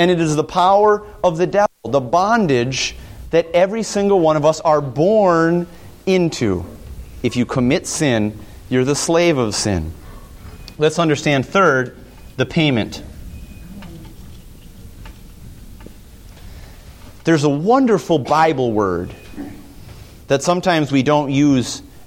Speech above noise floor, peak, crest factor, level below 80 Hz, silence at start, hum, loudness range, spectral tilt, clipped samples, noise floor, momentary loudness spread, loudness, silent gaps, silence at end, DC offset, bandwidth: 23 dB; -2 dBFS; 16 dB; -40 dBFS; 0 s; none; 8 LU; -5.5 dB/octave; under 0.1%; -39 dBFS; 21 LU; -17 LUFS; none; 0 s; under 0.1%; 17 kHz